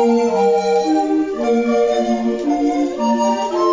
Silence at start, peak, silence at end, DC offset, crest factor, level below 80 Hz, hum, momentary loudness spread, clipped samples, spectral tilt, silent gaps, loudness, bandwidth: 0 s; -4 dBFS; 0 s; under 0.1%; 12 dB; -54 dBFS; none; 4 LU; under 0.1%; -5 dB/octave; none; -17 LUFS; 7.6 kHz